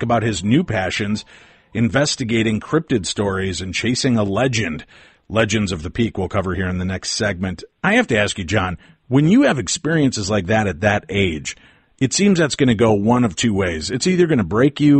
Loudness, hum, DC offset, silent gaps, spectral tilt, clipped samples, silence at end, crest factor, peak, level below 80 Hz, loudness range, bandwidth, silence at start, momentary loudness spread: -18 LUFS; none; under 0.1%; none; -5 dB/octave; under 0.1%; 0 s; 14 dB; -4 dBFS; -44 dBFS; 3 LU; 8.8 kHz; 0 s; 8 LU